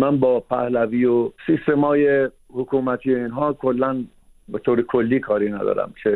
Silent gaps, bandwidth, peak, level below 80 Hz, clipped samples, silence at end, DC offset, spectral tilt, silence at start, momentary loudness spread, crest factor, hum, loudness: none; 4.2 kHz; -4 dBFS; -54 dBFS; under 0.1%; 0 s; under 0.1%; -9.5 dB/octave; 0 s; 7 LU; 16 dB; none; -20 LUFS